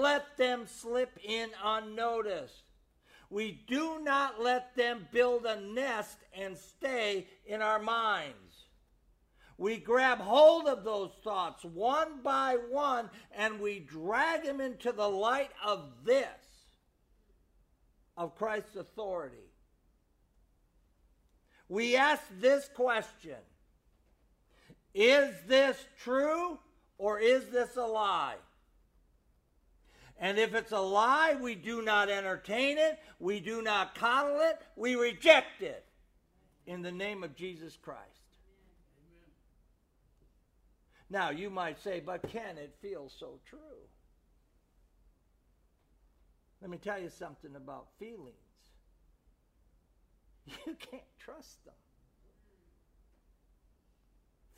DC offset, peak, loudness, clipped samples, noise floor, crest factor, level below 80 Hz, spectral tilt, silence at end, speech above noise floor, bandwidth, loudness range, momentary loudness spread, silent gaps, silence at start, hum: under 0.1%; -8 dBFS; -31 LUFS; under 0.1%; -71 dBFS; 26 dB; -68 dBFS; -3.5 dB/octave; 3.15 s; 38 dB; 15.5 kHz; 19 LU; 20 LU; none; 0 s; none